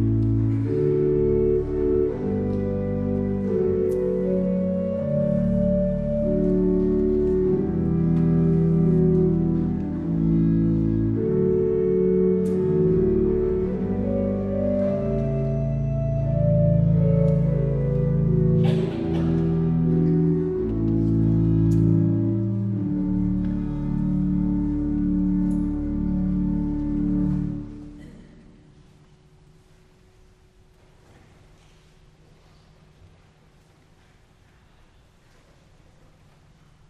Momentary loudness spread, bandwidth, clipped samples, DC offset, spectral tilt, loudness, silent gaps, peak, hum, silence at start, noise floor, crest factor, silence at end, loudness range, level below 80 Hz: 6 LU; 4.3 kHz; under 0.1%; under 0.1%; -11.5 dB/octave; -22 LUFS; none; -8 dBFS; none; 0 s; -55 dBFS; 14 dB; 8.65 s; 4 LU; -36 dBFS